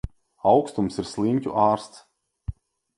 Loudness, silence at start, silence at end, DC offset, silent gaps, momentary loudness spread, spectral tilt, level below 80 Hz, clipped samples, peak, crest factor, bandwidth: -23 LUFS; 0.05 s; 0.45 s; under 0.1%; none; 18 LU; -7 dB/octave; -44 dBFS; under 0.1%; -6 dBFS; 20 dB; 11.5 kHz